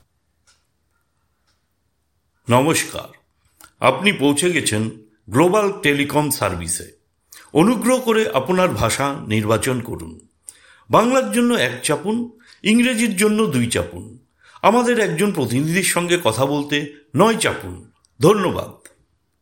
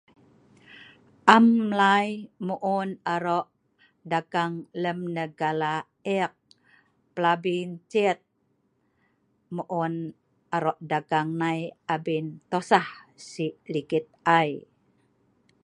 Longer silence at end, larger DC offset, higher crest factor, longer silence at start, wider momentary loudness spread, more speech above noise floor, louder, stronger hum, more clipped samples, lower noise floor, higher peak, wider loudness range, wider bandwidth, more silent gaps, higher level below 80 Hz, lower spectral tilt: second, 0.7 s vs 1.05 s; neither; second, 20 dB vs 26 dB; first, 2.5 s vs 0.8 s; second, 10 LU vs 13 LU; first, 51 dB vs 46 dB; first, -18 LUFS vs -26 LUFS; neither; neither; about the same, -69 dBFS vs -71 dBFS; about the same, 0 dBFS vs 0 dBFS; second, 2 LU vs 7 LU; first, 17 kHz vs 10.5 kHz; neither; first, -52 dBFS vs -74 dBFS; second, -4.5 dB/octave vs -6 dB/octave